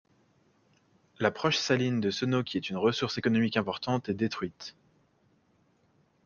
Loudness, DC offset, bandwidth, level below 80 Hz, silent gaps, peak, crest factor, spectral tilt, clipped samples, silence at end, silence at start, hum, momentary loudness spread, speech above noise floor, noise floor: -29 LUFS; under 0.1%; 7.2 kHz; -68 dBFS; none; -10 dBFS; 22 dB; -5.5 dB/octave; under 0.1%; 1.55 s; 1.2 s; none; 8 LU; 39 dB; -68 dBFS